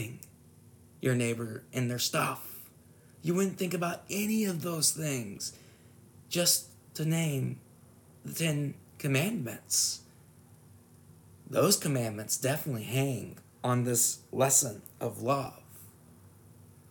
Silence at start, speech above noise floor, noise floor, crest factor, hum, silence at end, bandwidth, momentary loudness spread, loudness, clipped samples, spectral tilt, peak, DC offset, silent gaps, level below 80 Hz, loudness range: 0 s; 27 dB; -57 dBFS; 22 dB; none; 0.6 s; 19.5 kHz; 15 LU; -30 LUFS; under 0.1%; -3.5 dB/octave; -10 dBFS; under 0.1%; none; -72 dBFS; 4 LU